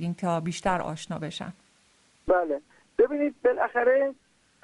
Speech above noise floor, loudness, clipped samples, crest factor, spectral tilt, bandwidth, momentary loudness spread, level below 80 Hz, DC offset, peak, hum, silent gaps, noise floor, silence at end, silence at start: 36 dB; -27 LUFS; under 0.1%; 18 dB; -6 dB/octave; 11.5 kHz; 12 LU; -56 dBFS; under 0.1%; -10 dBFS; none; none; -63 dBFS; 0.5 s; 0 s